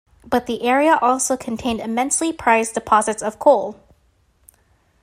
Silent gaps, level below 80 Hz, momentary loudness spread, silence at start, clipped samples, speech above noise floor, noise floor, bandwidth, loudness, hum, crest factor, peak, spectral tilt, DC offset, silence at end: none; -52 dBFS; 8 LU; 0.25 s; under 0.1%; 41 dB; -60 dBFS; 16 kHz; -18 LUFS; none; 18 dB; -2 dBFS; -3 dB/octave; under 0.1%; 1.3 s